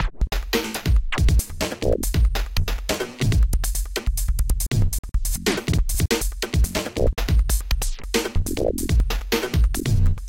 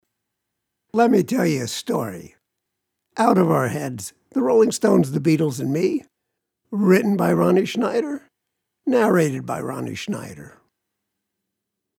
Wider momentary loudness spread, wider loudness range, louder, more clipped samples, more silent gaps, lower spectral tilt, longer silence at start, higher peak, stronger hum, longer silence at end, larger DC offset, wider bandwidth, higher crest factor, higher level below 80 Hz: second, 5 LU vs 13 LU; second, 1 LU vs 5 LU; second, -23 LUFS vs -20 LUFS; neither; first, 4.99-5.03 s vs none; second, -4.5 dB/octave vs -6 dB/octave; second, 0 s vs 0.95 s; about the same, -6 dBFS vs -4 dBFS; neither; second, 0 s vs 1.5 s; first, 0.2% vs under 0.1%; about the same, 17 kHz vs 17.5 kHz; about the same, 14 dB vs 18 dB; first, -22 dBFS vs -64 dBFS